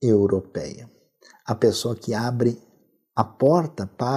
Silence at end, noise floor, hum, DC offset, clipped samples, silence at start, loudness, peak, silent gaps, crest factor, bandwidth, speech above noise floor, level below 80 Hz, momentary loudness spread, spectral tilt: 0 s; -62 dBFS; none; under 0.1%; under 0.1%; 0 s; -23 LUFS; -4 dBFS; none; 20 dB; 15 kHz; 39 dB; -62 dBFS; 16 LU; -6.5 dB/octave